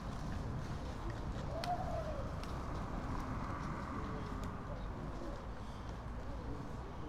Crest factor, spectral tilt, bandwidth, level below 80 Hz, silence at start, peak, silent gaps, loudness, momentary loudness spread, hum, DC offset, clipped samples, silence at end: 18 dB; -6.5 dB/octave; 14.5 kHz; -46 dBFS; 0 s; -24 dBFS; none; -44 LUFS; 6 LU; none; under 0.1%; under 0.1%; 0 s